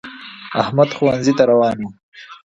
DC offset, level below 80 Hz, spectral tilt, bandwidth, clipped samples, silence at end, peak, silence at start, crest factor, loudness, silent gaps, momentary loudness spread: under 0.1%; -54 dBFS; -6 dB/octave; 8 kHz; under 0.1%; 0.2 s; 0 dBFS; 0.05 s; 18 dB; -16 LUFS; 2.03-2.12 s; 18 LU